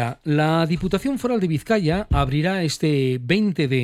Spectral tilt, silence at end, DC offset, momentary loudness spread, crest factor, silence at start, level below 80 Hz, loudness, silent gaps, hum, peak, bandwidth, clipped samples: -6.5 dB/octave; 0 s; under 0.1%; 3 LU; 14 dB; 0 s; -36 dBFS; -21 LUFS; none; none; -6 dBFS; 15 kHz; under 0.1%